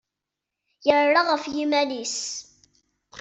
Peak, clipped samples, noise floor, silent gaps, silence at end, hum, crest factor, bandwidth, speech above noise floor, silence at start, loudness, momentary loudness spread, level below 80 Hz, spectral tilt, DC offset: -4 dBFS; under 0.1%; -85 dBFS; none; 0 s; none; 20 dB; 8.2 kHz; 63 dB; 0.85 s; -23 LUFS; 11 LU; -68 dBFS; -1.5 dB/octave; under 0.1%